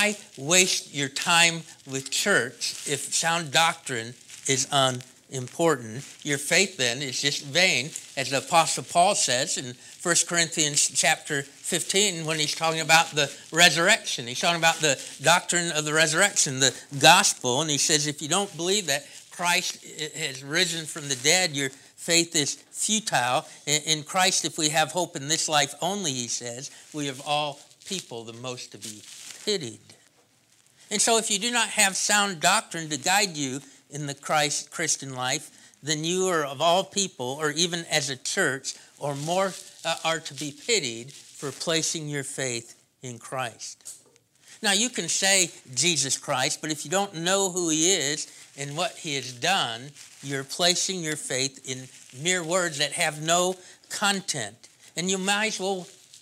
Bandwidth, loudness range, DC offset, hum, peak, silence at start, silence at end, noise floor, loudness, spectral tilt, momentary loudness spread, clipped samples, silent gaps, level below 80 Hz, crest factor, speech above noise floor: 16 kHz; 8 LU; under 0.1%; none; 0 dBFS; 0 s; 0.05 s; -62 dBFS; -24 LUFS; -1.5 dB/octave; 15 LU; under 0.1%; none; -78 dBFS; 26 dB; 36 dB